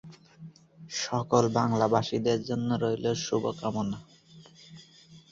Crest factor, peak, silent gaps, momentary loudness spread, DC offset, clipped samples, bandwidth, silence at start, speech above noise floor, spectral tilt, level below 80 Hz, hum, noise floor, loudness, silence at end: 22 dB; -8 dBFS; none; 19 LU; under 0.1%; under 0.1%; 7.8 kHz; 0.05 s; 27 dB; -5.5 dB/octave; -62 dBFS; none; -54 dBFS; -28 LUFS; 0.1 s